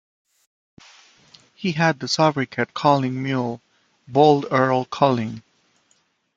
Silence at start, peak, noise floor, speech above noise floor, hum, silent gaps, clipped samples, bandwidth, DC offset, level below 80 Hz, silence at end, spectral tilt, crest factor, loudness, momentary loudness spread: 1.6 s; -2 dBFS; -65 dBFS; 45 dB; none; none; under 0.1%; 9.2 kHz; under 0.1%; -64 dBFS; 1 s; -5.5 dB/octave; 20 dB; -20 LUFS; 13 LU